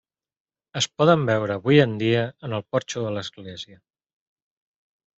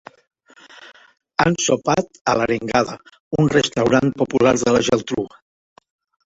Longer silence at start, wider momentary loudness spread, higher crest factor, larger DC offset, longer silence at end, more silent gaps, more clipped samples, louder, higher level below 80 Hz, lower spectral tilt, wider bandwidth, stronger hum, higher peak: about the same, 0.75 s vs 0.8 s; first, 18 LU vs 10 LU; about the same, 22 dB vs 18 dB; neither; first, 1.45 s vs 1.05 s; second, none vs 2.21-2.25 s, 3.20-3.31 s; neither; second, -22 LUFS vs -19 LUFS; second, -64 dBFS vs -50 dBFS; about the same, -5.5 dB/octave vs -4.5 dB/octave; about the same, 8.2 kHz vs 8.2 kHz; neither; about the same, -2 dBFS vs -2 dBFS